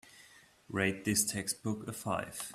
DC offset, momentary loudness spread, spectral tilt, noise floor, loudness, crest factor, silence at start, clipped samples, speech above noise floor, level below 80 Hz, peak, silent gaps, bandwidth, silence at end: under 0.1%; 8 LU; -3.5 dB/octave; -60 dBFS; -34 LUFS; 24 dB; 0.05 s; under 0.1%; 25 dB; -68 dBFS; -14 dBFS; none; 15.5 kHz; 0 s